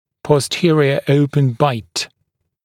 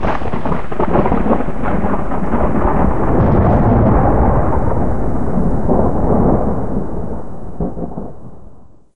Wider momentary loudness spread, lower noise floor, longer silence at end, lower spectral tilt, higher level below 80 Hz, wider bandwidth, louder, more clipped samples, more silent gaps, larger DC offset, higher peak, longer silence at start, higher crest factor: about the same, 10 LU vs 12 LU; first, -71 dBFS vs -40 dBFS; first, 0.6 s vs 0 s; second, -6 dB/octave vs -10.5 dB/octave; second, -56 dBFS vs -22 dBFS; first, 14.5 kHz vs 6.6 kHz; about the same, -16 LUFS vs -16 LUFS; neither; neither; second, under 0.1% vs 20%; about the same, 0 dBFS vs 0 dBFS; first, 0.25 s vs 0 s; about the same, 16 dB vs 14 dB